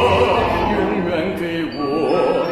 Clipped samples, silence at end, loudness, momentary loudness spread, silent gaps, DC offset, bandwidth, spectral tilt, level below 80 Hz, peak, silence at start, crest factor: under 0.1%; 0 s; -18 LUFS; 7 LU; none; under 0.1%; 14 kHz; -6.5 dB/octave; -38 dBFS; -4 dBFS; 0 s; 14 dB